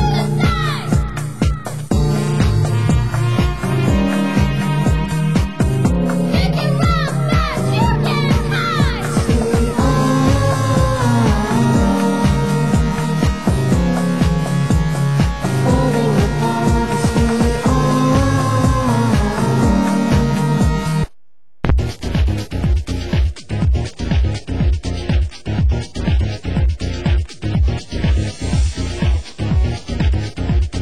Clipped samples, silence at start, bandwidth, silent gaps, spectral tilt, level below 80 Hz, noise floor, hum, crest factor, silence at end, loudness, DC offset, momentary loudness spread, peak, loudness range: under 0.1%; 0 s; 12.5 kHz; none; -6.5 dB/octave; -22 dBFS; -70 dBFS; none; 16 dB; 0 s; -17 LUFS; 2%; 5 LU; 0 dBFS; 4 LU